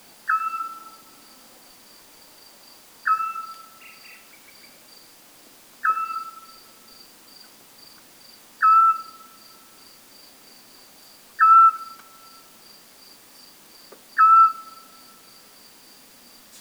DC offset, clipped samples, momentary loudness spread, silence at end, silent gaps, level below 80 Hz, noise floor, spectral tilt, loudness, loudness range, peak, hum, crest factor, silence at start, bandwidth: under 0.1%; under 0.1%; 30 LU; 2 s; none; -78 dBFS; -50 dBFS; 0 dB/octave; -18 LUFS; 11 LU; -6 dBFS; none; 18 dB; 0.25 s; over 20 kHz